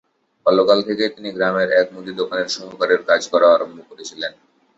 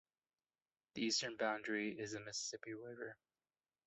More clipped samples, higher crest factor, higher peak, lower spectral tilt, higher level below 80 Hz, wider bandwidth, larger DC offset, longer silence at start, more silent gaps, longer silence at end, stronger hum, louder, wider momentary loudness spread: neither; about the same, 18 dB vs 20 dB; first, -2 dBFS vs -26 dBFS; about the same, -3.5 dB/octave vs -2.5 dB/octave; first, -64 dBFS vs -84 dBFS; about the same, 8 kHz vs 8.2 kHz; neither; second, 0.45 s vs 0.95 s; neither; second, 0.5 s vs 0.7 s; neither; first, -18 LUFS vs -43 LUFS; about the same, 14 LU vs 13 LU